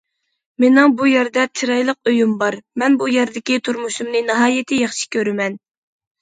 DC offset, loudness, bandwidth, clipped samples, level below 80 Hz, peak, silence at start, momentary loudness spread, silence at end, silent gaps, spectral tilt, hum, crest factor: under 0.1%; -17 LUFS; 9.4 kHz; under 0.1%; -68 dBFS; 0 dBFS; 0.6 s; 9 LU; 0.65 s; none; -3.5 dB/octave; none; 16 dB